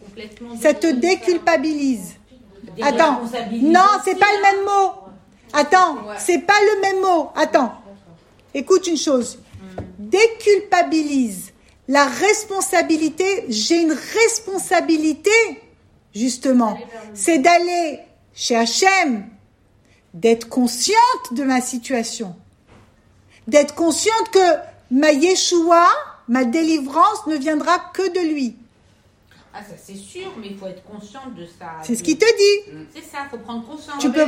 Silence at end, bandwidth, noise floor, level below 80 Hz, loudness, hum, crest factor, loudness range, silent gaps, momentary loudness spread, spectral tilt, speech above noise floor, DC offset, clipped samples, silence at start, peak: 0 s; 16 kHz; -55 dBFS; -60 dBFS; -17 LUFS; none; 18 dB; 5 LU; none; 20 LU; -2.5 dB/octave; 37 dB; under 0.1%; under 0.1%; 0.05 s; 0 dBFS